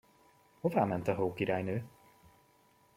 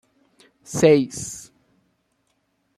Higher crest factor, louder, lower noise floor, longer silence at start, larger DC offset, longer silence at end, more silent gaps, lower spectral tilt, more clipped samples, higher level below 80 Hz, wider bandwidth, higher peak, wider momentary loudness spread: about the same, 22 dB vs 22 dB; second, -34 LUFS vs -20 LUFS; about the same, -67 dBFS vs -70 dBFS; about the same, 0.65 s vs 0.7 s; neither; second, 1.05 s vs 1.4 s; neither; first, -8 dB/octave vs -5.5 dB/octave; neither; second, -70 dBFS vs -60 dBFS; about the same, 16.5 kHz vs 15 kHz; second, -14 dBFS vs -2 dBFS; second, 8 LU vs 18 LU